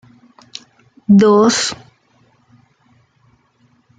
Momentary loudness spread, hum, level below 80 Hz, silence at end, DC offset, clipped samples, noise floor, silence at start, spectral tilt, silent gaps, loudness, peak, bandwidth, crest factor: 25 LU; none; -60 dBFS; 2.25 s; under 0.1%; under 0.1%; -57 dBFS; 1.1 s; -5 dB/octave; none; -12 LUFS; -2 dBFS; 9.4 kHz; 16 dB